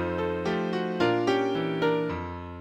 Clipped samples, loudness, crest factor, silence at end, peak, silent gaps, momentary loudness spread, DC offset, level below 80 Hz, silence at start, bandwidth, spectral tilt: under 0.1%; -27 LUFS; 16 dB; 0 s; -10 dBFS; none; 7 LU; under 0.1%; -54 dBFS; 0 s; 15.5 kHz; -6.5 dB/octave